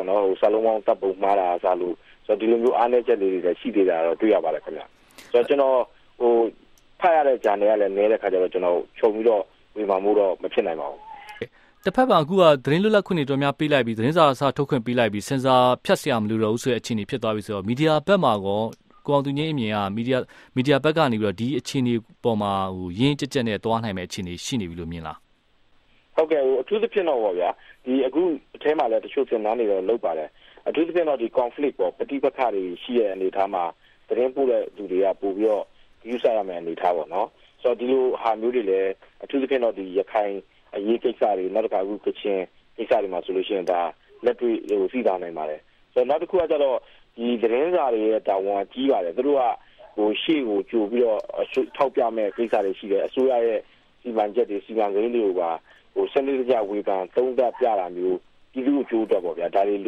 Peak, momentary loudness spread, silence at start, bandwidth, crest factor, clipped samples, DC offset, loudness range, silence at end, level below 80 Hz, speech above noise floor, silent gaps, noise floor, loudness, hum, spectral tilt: -2 dBFS; 10 LU; 0 s; 13.5 kHz; 20 dB; under 0.1%; under 0.1%; 4 LU; 0 s; -60 dBFS; 37 dB; none; -60 dBFS; -23 LUFS; none; -6.5 dB/octave